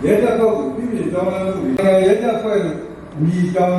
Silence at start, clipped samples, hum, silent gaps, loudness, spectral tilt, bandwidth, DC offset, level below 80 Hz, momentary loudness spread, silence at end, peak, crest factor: 0 s; under 0.1%; none; none; -17 LUFS; -7.5 dB/octave; 12.5 kHz; under 0.1%; -46 dBFS; 8 LU; 0 s; -2 dBFS; 14 dB